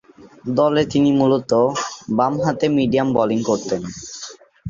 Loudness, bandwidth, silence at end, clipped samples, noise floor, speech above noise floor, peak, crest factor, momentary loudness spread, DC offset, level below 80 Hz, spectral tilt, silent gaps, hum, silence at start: -18 LUFS; 7.6 kHz; 0 s; under 0.1%; -38 dBFS; 21 dB; -2 dBFS; 16 dB; 15 LU; under 0.1%; -54 dBFS; -6 dB/octave; none; none; 0.2 s